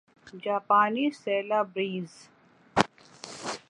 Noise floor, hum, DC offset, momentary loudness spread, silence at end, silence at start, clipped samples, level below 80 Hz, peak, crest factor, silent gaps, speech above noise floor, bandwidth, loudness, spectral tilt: -47 dBFS; none; under 0.1%; 16 LU; 0.1 s; 0.25 s; under 0.1%; -64 dBFS; 0 dBFS; 30 dB; none; 20 dB; 11.5 kHz; -28 LUFS; -4.5 dB/octave